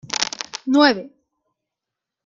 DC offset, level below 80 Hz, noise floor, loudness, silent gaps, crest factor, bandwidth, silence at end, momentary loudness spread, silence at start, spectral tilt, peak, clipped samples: under 0.1%; -68 dBFS; -85 dBFS; -19 LUFS; none; 22 dB; 7.8 kHz; 1.15 s; 13 LU; 0.05 s; -2 dB/octave; 0 dBFS; under 0.1%